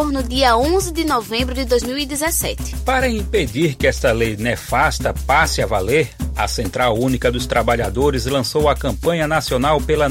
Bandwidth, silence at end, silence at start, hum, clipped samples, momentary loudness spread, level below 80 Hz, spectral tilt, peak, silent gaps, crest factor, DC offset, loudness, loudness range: 16.5 kHz; 0 s; 0 s; none; under 0.1%; 5 LU; -28 dBFS; -4.5 dB/octave; -2 dBFS; none; 16 dB; under 0.1%; -18 LUFS; 1 LU